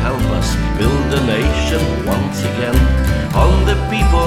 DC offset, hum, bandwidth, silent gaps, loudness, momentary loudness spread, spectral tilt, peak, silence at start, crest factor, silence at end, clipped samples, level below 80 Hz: under 0.1%; none; 15 kHz; none; -16 LUFS; 4 LU; -6 dB/octave; 0 dBFS; 0 s; 14 dB; 0 s; under 0.1%; -18 dBFS